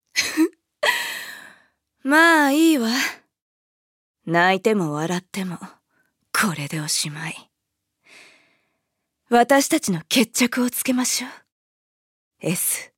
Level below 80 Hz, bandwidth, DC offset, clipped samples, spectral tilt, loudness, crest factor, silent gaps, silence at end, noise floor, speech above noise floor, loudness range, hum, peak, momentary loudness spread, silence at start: -72 dBFS; 17 kHz; under 0.1%; under 0.1%; -3 dB/octave; -20 LUFS; 20 dB; 3.42-4.14 s, 11.52-12.31 s; 0.15 s; -79 dBFS; 59 dB; 8 LU; none; -2 dBFS; 16 LU; 0.15 s